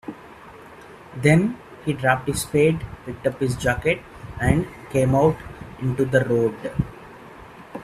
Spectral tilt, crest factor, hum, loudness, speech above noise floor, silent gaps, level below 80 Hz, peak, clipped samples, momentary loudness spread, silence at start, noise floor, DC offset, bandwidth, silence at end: -6.5 dB/octave; 22 dB; none; -22 LUFS; 23 dB; none; -42 dBFS; -2 dBFS; under 0.1%; 24 LU; 0.05 s; -43 dBFS; under 0.1%; 14.5 kHz; 0 s